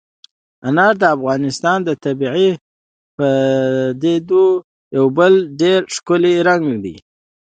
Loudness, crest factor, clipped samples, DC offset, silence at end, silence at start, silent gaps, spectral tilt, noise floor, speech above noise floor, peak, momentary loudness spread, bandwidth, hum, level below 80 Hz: -15 LUFS; 16 dB; under 0.1%; under 0.1%; 0.55 s; 0.65 s; 2.61-3.18 s, 4.64-4.91 s; -5.5 dB/octave; under -90 dBFS; over 76 dB; 0 dBFS; 9 LU; 9.2 kHz; none; -58 dBFS